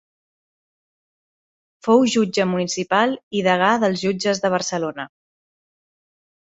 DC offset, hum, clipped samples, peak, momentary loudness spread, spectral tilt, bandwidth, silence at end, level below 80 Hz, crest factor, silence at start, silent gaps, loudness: under 0.1%; none; under 0.1%; -2 dBFS; 10 LU; -4.5 dB/octave; 8.2 kHz; 1.4 s; -64 dBFS; 20 dB; 1.85 s; 3.23-3.31 s; -20 LUFS